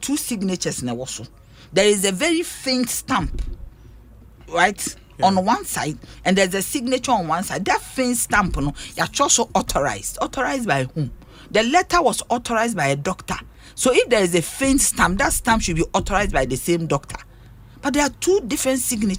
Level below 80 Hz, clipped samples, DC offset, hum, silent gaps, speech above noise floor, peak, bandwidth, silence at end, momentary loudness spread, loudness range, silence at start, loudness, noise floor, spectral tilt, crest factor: -36 dBFS; under 0.1%; under 0.1%; none; none; 24 dB; -2 dBFS; 19.5 kHz; 0 s; 11 LU; 3 LU; 0 s; -20 LUFS; -44 dBFS; -3.5 dB/octave; 20 dB